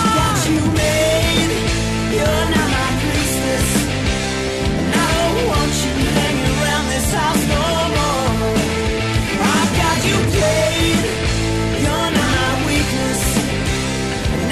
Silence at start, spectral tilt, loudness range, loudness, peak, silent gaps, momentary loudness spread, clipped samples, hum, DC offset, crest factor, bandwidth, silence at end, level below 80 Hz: 0 s; -4.5 dB/octave; 1 LU; -17 LUFS; -6 dBFS; none; 4 LU; under 0.1%; none; under 0.1%; 12 dB; 14 kHz; 0 s; -28 dBFS